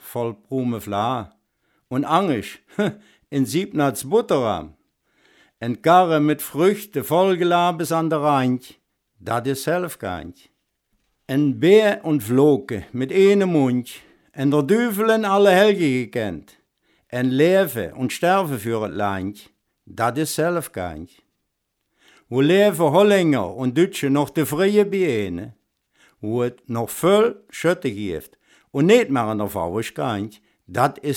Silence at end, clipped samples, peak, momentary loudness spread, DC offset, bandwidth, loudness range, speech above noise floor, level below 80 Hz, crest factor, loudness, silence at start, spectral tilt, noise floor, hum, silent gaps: 0 s; under 0.1%; -2 dBFS; 14 LU; under 0.1%; 19 kHz; 6 LU; 56 dB; -58 dBFS; 20 dB; -20 LUFS; 0.05 s; -6 dB/octave; -75 dBFS; none; none